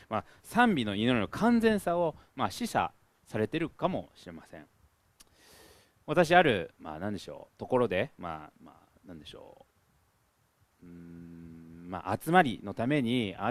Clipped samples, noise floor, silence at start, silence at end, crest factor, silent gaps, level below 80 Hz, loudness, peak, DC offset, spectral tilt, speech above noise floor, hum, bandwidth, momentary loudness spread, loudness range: under 0.1%; -71 dBFS; 0.1 s; 0 s; 26 dB; none; -60 dBFS; -29 LUFS; -6 dBFS; under 0.1%; -6 dB/octave; 41 dB; none; 14.5 kHz; 23 LU; 17 LU